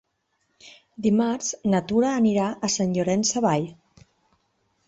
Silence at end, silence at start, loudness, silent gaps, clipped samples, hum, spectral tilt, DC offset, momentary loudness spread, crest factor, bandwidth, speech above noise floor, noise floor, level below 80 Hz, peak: 1.15 s; 0.65 s; -23 LUFS; none; under 0.1%; none; -5 dB/octave; under 0.1%; 6 LU; 16 dB; 8.2 kHz; 50 dB; -73 dBFS; -62 dBFS; -8 dBFS